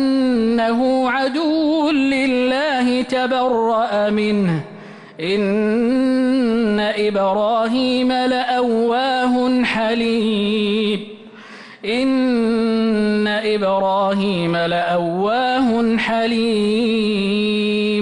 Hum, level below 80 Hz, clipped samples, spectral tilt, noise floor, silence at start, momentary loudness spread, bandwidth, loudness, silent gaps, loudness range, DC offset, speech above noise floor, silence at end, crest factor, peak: none; -52 dBFS; under 0.1%; -6 dB/octave; -39 dBFS; 0 s; 3 LU; 10.5 kHz; -18 LUFS; none; 2 LU; under 0.1%; 21 dB; 0 s; 8 dB; -10 dBFS